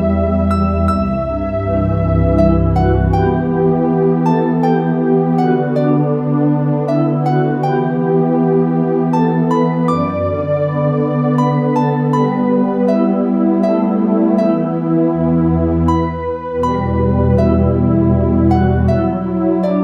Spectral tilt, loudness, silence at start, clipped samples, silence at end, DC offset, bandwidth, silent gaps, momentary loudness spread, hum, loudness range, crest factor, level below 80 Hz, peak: -10 dB/octave; -15 LUFS; 0 s; under 0.1%; 0 s; under 0.1%; 7.4 kHz; none; 4 LU; none; 1 LU; 14 dB; -28 dBFS; 0 dBFS